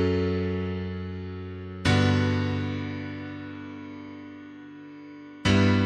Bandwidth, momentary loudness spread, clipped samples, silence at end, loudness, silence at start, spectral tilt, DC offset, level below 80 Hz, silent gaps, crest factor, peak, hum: 9.6 kHz; 22 LU; under 0.1%; 0 s; -27 LUFS; 0 s; -6.5 dB/octave; under 0.1%; -50 dBFS; none; 18 dB; -10 dBFS; none